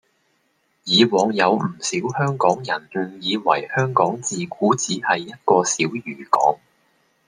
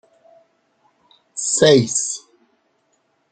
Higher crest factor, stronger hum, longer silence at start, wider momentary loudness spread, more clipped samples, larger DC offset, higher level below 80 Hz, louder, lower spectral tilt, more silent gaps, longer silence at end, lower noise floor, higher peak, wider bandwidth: about the same, 20 dB vs 20 dB; neither; second, 0.85 s vs 1.35 s; second, 8 LU vs 17 LU; neither; neither; second, -66 dBFS vs -60 dBFS; second, -20 LUFS vs -17 LUFS; about the same, -4 dB/octave vs -3.5 dB/octave; neither; second, 0.7 s vs 1.15 s; about the same, -66 dBFS vs -66 dBFS; about the same, 0 dBFS vs -2 dBFS; first, 10.5 kHz vs 9.4 kHz